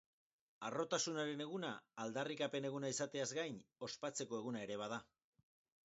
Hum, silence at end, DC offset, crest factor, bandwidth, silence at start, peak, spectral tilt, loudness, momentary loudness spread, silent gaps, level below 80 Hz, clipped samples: none; 0.8 s; under 0.1%; 20 dB; 7.6 kHz; 0.6 s; -26 dBFS; -3.5 dB/octave; -44 LUFS; 8 LU; none; -86 dBFS; under 0.1%